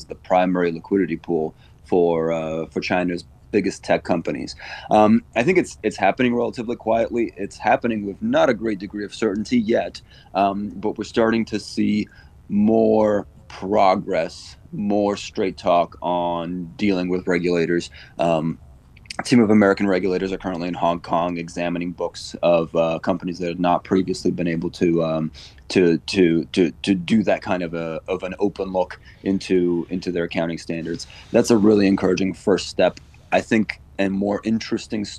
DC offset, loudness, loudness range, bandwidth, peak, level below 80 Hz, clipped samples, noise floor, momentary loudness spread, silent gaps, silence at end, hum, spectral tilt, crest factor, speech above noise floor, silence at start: under 0.1%; -21 LUFS; 3 LU; 12 kHz; -2 dBFS; -50 dBFS; under 0.1%; -41 dBFS; 10 LU; none; 0 s; none; -6 dB/octave; 20 dB; 20 dB; 0 s